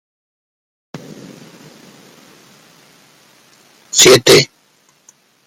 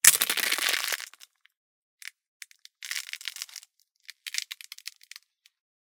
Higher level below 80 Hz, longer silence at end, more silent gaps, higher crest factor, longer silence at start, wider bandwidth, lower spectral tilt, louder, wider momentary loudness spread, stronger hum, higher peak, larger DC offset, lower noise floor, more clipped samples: first, -54 dBFS vs -88 dBFS; about the same, 1 s vs 1.1 s; second, none vs 1.57-1.98 s, 2.27-2.40 s; second, 18 dB vs 32 dB; first, 0.95 s vs 0.05 s; second, 17 kHz vs 19 kHz; first, -2.5 dB/octave vs 2.5 dB/octave; first, -9 LUFS vs -28 LUFS; first, 28 LU vs 24 LU; neither; about the same, 0 dBFS vs 0 dBFS; neither; second, -55 dBFS vs -59 dBFS; neither